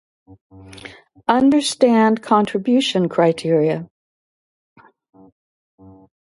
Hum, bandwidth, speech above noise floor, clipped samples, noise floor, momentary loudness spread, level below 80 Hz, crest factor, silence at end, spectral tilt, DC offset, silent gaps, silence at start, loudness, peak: none; 11.5 kHz; over 73 dB; under 0.1%; under -90 dBFS; 21 LU; -60 dBFS; 20 dB; 2.5 s; -5.5 dB/octave; under 0.1%; none; 0.75 s; -17 LUFS; 0 dBFS